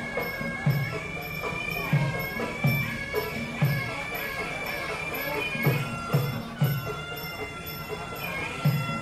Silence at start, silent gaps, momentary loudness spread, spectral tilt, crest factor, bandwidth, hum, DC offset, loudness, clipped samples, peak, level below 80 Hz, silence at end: 0 s; none; 8 LU; -6 dB/octave; 18 dB; 14 kHz; none; under 0.1%; -29 LUFS; under 0.1%; -12 dBFS; -50 dBFS; 0 s